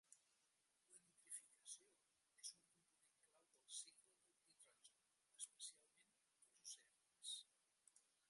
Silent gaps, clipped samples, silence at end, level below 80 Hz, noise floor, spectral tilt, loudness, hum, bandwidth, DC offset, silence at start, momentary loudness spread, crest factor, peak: none; under 0.1%; 0.3 s; under -90 dBFS; -86 dBFS; 3 dB/octave; -58 LUFS; none; 11.5 kHz; under 0.1%; 0.1 s; 8 LU; 26 dB; -38 dBFS